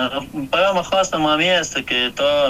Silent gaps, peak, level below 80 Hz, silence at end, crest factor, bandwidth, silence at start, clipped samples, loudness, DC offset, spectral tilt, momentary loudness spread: none; -6 dBFS; -48 dBFS; 0 s; 14 dB; 15.5 kHz; 0 s; under 0.1%; -18 LUFS; under 0.1%; -3 dB/octave; 6 LU